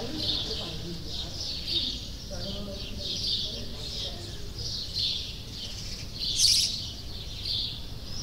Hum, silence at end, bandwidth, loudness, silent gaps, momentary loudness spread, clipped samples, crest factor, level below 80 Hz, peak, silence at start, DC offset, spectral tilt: none; 0 s; 16 kHz; -30 LUFS; none; 14 LU; under 0.1%; 24 dB; -42 dBFS; -8 dBFS; 0 s; under 0.1%; -2 dB/octave